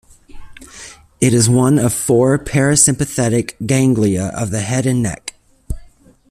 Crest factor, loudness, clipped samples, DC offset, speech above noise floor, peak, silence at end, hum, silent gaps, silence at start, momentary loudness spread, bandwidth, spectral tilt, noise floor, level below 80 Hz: 16 dB; -15 LUFS; under 0.1%; under 0.1%; 30 dB; 0 dBFS; 0.45 s; none; none; 0.35 s; 20 LU; 14.5 kHz; -5 dB/octave; -44 dBFS; -38 dBFS